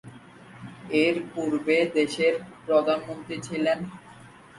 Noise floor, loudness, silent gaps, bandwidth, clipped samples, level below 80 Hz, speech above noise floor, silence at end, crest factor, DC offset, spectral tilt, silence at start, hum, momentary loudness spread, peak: -49 dBFS; -25 LUFS; none; 11.5 kHz; under 0.1%; -66 dBFS; 24 dB; 0 s; 18 dB; under 0.1%; -5 dB/octave; 0.05 s; none; 18 LU; -8 dBFS